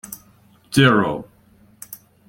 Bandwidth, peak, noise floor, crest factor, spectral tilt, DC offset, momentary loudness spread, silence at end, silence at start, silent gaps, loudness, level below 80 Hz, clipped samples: 17 kHz; -2 dBFS; -53 dBFS; 20 dB; -5.5 dB/octave; under 0.1%; 23 LU; 0.35 s; 0.05 s; none; -17 LUFS; -54 dBFS; under 0.1%